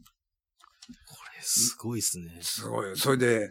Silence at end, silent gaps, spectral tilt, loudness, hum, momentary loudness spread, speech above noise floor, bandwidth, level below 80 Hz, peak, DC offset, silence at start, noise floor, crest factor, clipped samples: 0 s; none; -3 dB/octave; -27 LUFS; none; 20 LU; 51 dB; 17.5 kHz; -68 dBFS; -10 dBFS; under 0.1%; 0.8 s; -80 dBFS; 20 dB; under 0.1%